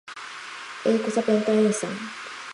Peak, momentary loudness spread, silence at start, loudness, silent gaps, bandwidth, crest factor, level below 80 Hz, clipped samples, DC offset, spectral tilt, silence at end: -8 dBFS; 15 LU; 0.05 s; -24 LUFS; none; 11.5 kHz; 16 dB; -74 dBFS; under 0.1%; under 0.1%; -5 dB/octave; 0 s